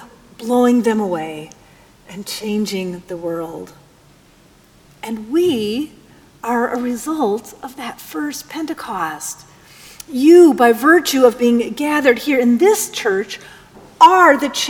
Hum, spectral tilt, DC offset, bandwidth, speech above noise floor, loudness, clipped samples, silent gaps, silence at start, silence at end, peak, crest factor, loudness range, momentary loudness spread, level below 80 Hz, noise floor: none; -4 dB/octave; under 0.1%; 19 kHz; 34 dB; -15 LUFS; under 0.1%; none; 0 s; 0 s; 0 dBFS; 16 dB; 13 LU; 20 LU; -56 dBFS; -49 dBFS